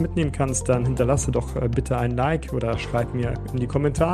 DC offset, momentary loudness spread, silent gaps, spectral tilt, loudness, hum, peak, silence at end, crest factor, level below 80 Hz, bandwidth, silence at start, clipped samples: under 0.1%; 5 LU; none; -6 dB/octave; -24 LUFS; none; -6 dBFS; 0 s; 16 dB; -34 dBFS; 13.5 kHz; 0 s; under 0.1%